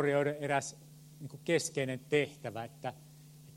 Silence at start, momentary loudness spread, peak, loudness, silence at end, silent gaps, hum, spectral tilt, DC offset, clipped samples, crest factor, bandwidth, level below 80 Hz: 0 s; 22 LU; -16 dBFS; -35 LUFS; 0 s; none; none; -4.5 dB/octave; under 0.1%; under 0.1%; 20 dB; 16.5 kHz; -74 dBFS